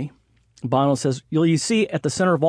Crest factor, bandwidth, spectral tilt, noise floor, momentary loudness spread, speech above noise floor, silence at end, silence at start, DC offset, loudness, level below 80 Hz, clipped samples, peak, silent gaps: 14 dB; 11 kHz; -5.5 dB/octave; -57 dBFS; 7 LU; 37 dB; 0 s; 0 s; under 0.1%; -21 LUFS; -60 dBFS; under 0.1%; -6 dBFS; none